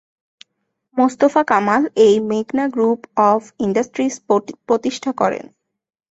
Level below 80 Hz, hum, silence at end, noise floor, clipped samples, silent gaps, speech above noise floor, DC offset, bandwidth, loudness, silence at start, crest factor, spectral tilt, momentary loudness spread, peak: -62 dBFS; none; 0.7 s; -73 dBFS; under 0.1%; none; 57 dB; under 0.1%; 8 kHz; -17 LUFS; 0.95 s; 16 dB; -5.5 dB/octave; 7 LU; -2 dBFS